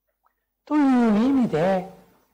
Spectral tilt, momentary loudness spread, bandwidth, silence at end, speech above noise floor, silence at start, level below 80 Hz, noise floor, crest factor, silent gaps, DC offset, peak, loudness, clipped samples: -8 dB/octave; 8 LU; 9.4 kHz; 0.4 s; 51 dB; 0.7 s; -58 dBFS; -71 dBFS; 8 dB; none; under 0.1%; -14 dBFS; -21 LUFS; under 0.1%